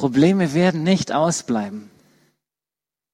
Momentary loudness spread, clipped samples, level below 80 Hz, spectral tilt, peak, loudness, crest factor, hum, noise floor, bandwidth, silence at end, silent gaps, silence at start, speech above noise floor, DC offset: 10 LU; under 0.1%; -58 dBFS; -5.5 dB/octave; -4 dBFS; -19 LUFS; 16 dB; none; -90 dBFS; 12 kHz; 1.3 s; none; 0 s; 71 dB; under 0.1%